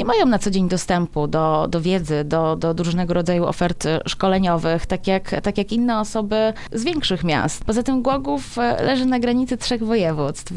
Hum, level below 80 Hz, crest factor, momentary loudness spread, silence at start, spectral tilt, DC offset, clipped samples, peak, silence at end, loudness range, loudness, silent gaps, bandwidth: none; -38 dBFS; 16 dB; 4 LU; 0 s; -5.5 dB/octave; under 0.1%; under 0.1%; -4 dBFS; 0 s; 1 LU; -20 LUFS; none; 12 kHz